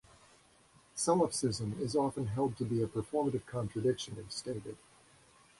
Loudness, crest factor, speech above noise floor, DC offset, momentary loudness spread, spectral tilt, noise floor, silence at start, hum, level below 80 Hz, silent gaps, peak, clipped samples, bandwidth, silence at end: -35 LUFS; 18 dB; 30 dB; under 0.1%; 12 LU; -5.5 dB/octave; -64 dBFS; 0.95 s; none; -62 dBFS; none; -18 dBFS; under 0.1%; 11.5 kHz; 0.85 s